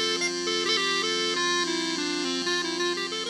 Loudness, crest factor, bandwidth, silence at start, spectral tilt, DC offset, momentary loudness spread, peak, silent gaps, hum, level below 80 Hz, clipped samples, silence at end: -25 LUFS; 14 dB; 13.5 kHz; 0 s; -1.5 dB/octave; under 0.1%; 4 LU; -14 dBFS; none; none; -70 dBFS; under 0.1%; 0 s